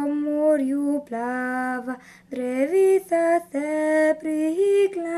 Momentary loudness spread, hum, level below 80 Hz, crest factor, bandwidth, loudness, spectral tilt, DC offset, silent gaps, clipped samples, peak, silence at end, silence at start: 9 LU; none; -68 dBFS; 12 dB; 13.5 kHz; -22 LUFS; -4.5 dB/octave; under 0.1%; none; under 0.1%; -10 dBFS; 0 s; 0 s